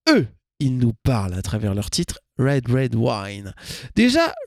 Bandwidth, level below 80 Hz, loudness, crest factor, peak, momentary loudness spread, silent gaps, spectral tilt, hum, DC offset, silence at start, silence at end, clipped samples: 15 kHz; -42 dBFS; -21 LUFS; 16 dB; -4 dBFS; 14 LU; none; -5.5 dB/octave; none; under 0.1%; 0.05 s; 0 s; under 0.1%